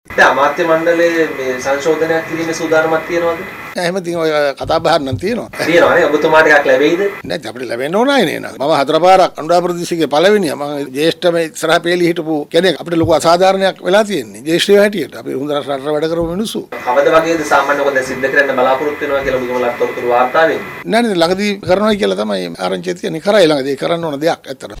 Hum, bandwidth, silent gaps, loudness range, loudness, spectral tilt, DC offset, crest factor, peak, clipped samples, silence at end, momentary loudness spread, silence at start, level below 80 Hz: none; 16.5 kHz; none; 3 LU; -13 LUFS; -4.5 dB/octave; under 0.1%; 12 dB; 0 dBFS; under 0.1%; 0 s; 9 LU; 0.1 s; -46 dBFS